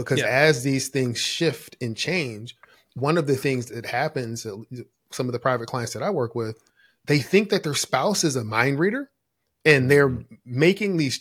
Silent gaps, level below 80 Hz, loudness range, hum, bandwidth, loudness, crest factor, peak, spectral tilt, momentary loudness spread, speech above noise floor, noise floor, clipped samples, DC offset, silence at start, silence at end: none; -60 dBFS; 6 LU; none; 16.5 kHz; -23 LUFS; 22 dB; -2 dBFS; -4.5 dB/octave; 16 LU; 54 dB; -77 dBFS; under 0.1%; under 0.1%; 0 s; 0 s